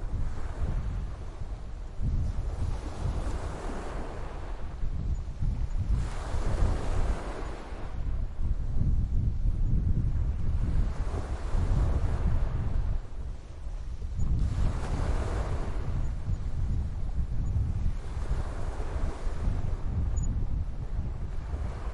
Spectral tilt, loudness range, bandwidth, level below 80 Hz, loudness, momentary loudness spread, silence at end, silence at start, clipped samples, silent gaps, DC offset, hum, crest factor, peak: -7.5 dB/octave; 5 LU; 10.5 kHz; -30 dBFS; -34 LUFS; 10 LU; 0 s; 0 s; under 0.1%; none; under 0.1%; none; 16 dB; -14 dBFS